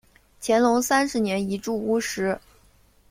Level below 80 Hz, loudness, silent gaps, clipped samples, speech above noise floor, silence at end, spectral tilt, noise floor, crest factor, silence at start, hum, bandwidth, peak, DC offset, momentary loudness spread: -58 dBFS; -24 LUFS; none; under 0.1%; 35 dB; 0.7 s; -4 dB/octave; -58 dBFS; 18 dB; 0.4 s; none; 16 kHz; -6 dBFS; under 0.1%; 8 LU